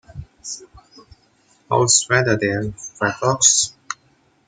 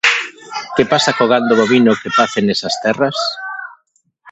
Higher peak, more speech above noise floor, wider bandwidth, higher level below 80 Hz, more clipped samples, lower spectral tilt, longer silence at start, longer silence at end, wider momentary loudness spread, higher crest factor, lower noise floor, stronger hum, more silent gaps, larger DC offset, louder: about the same, -2 dBFS vs 0 dBFS; second, 41 dB vs 47 dB; first, 15.5 kHz vs 8.2 kHz; about the same, -52 dBFS vs -54 dBFS; neither; second, -2.5 dB/octave vs -4 dB/octave; about the same, 0.15 s vs 0.05 s; first, 0.55 s vs 0 s; first, 20 LU vs 14 LU; about the same, 20 dB vs 16 dB; about the same, -59 dBFS vs -61 dBFS; neither; neither; neither; second, -17 LUFS vs -14 LUFS